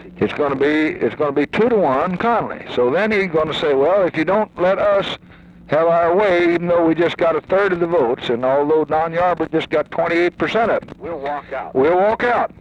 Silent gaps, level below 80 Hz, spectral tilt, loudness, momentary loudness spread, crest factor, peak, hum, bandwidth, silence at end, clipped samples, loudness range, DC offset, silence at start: none; -50 dBFS; -7 dB/octave; -17 LUFS; 6 LU; 12 dB; -4 dBFS; none; 8.8 kHz; 0.15 s; under 0.1%; 2 LU; under 0.1%; 0 s